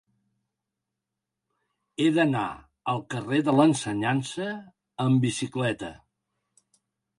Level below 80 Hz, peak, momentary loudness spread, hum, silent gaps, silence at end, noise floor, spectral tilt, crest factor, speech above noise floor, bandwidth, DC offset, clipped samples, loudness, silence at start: -64 dBFS; -8 dBFS; 14 LU; none; none; 1.25 s; -86 dBFS; -6 dB/octave; 20 dB; 61 dB; 11.5 kHz; under 0.1%; under 0.1%; -26 LUFS; 2 s